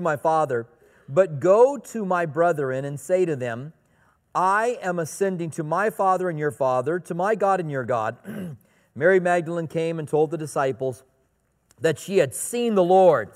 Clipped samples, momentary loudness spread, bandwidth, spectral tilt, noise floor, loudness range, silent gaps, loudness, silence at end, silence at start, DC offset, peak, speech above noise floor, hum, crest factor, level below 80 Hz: under 0.1%; 12 LU; 16 kHz; -6 dB/octave; -67 dBFS; 3 LU; none; -23 LUFS; 0.05 s; 0 s; under 0.1%; -6 dBFS; 45 dB; none; 18 dB; -70 dBFS